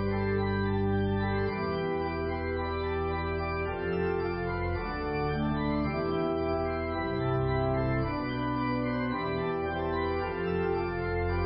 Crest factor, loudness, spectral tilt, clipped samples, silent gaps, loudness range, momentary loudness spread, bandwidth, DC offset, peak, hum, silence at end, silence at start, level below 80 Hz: 12 dB; -31 LUFS; -11 dB/octave; under 0.1%; none; 1 LU; 3 LU; 5.6 kHz; under 0.1%; -18 dBFS; none; 0 s; 0 s; -40 dBFS